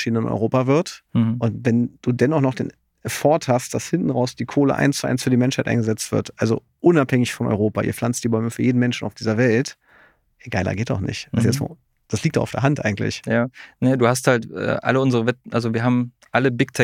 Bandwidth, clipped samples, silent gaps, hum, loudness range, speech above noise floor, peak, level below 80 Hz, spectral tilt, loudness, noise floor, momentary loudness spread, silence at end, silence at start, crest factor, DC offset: 16 kHz; under 0.1%; none; none; 3 LU; 35 dB; -2 dBFS; -54 dBFS; -6 dB/octave; -21 LUFS; -55 dBFS; 7 LU; 0 s; 0 s; 18 dB; under 0.1%